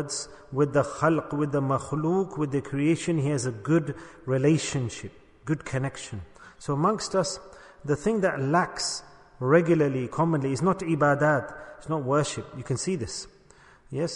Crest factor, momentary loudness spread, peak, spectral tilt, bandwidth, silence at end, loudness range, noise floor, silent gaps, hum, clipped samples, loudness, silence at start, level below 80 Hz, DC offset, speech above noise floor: 18 dB; 14 LU; -8 dBFS; -5.5 dB/octave; 10.5 kHz; 0 s; 4 LU; -55 dBFS; none; none; under 0.1%; -26 LUFS; 0 s; -56 dBFS; under 0.1%; 29 dB